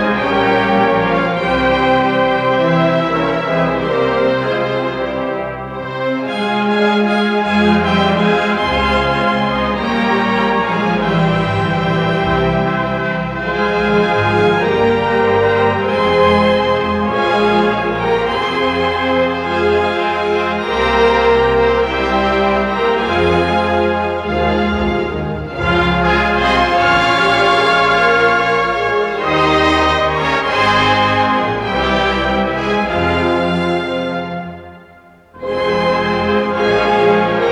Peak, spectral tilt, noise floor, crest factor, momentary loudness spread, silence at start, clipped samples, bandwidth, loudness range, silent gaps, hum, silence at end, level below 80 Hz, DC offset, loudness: -2 dBFS; -6 dB/octave; -43 dBFS; 12 dB; 6 LU; 0 s; under 0.1%; 10.5 kHz; 4 LU; none; none; 0 s; -34 dBFS; under 0.1%; -14 LUFS